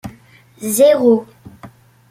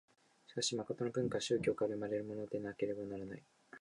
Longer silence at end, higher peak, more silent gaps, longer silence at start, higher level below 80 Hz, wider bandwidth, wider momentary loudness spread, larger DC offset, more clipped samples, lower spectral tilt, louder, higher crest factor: first, 0.45 s vs 0 s; first, -2 dBFS vs -22 dBFS; neither; second, 0.05 s vs 0.5 s; first, -56 dBFS vs -72 dBFS; first, 16.5 kHz vs 11 kHz; first, 18 LU vs 12 LU; neither; neither; about the same, -4.5 dB/octave vs -4.5 dB/octave; first, -13 LUFS vs -39 LUFS; about the same, 14 dB vs 18 dB